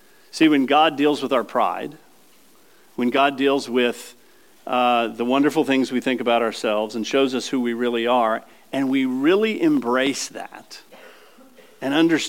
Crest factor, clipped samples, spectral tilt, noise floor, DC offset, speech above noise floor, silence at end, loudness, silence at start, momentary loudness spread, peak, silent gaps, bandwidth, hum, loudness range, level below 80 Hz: 18 dB; under 0.1%; -4 dB/octave; -54 dBFS; 0.2%; 34 dB; 0 s; -20 LUFS; 0.35 s; 17 LU; -4 dBFS; none; 17 kHz; none; 2 LU; -80 dBFS